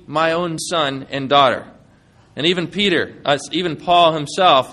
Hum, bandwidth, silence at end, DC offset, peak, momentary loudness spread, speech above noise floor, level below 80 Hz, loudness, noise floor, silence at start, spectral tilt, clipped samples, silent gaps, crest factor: none; 12.5 kHz; 0 s; under 0.1%; 0 dBFS; 8 LU; 34 dB; -56 dBFS; -17 LUFS; -51 dBFS; 0.1 s; -4 dB/octave; under 0.1%; none; 18 dB